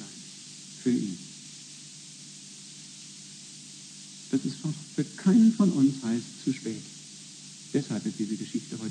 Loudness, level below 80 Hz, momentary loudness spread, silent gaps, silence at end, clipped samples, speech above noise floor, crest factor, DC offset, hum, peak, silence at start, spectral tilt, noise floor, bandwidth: -28 LUFS; -80 dBFS; 20 LU; none; 0 s; under 0.1%; 19 dB; 18 dB; under 0.1%; none; -12 dBFS; 0 s; -5.5 dB/octave; -46 dBFS; 10 kHz